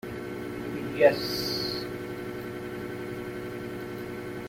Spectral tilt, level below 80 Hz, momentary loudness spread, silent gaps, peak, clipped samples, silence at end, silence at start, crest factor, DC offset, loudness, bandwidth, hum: -5 dB/octave; -56 dBFS; 14 LU; none; -6 dBFS; under 0.1%; 0 s; 0.05 s; 24 dB; under 0.1%; -31 LUFS; 16.5 kHz; none